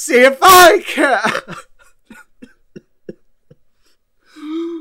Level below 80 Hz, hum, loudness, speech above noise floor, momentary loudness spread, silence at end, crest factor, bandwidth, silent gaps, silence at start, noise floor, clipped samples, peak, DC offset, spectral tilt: -48 dBFS; none; -10 LUFS; 46 dB; 23 LU; 0 s; 14 dB; 16.5 kHz; none; 0 s; -56 dBFS; 0.2%; 0 dBFS; under 0.1%; -2 dB/octave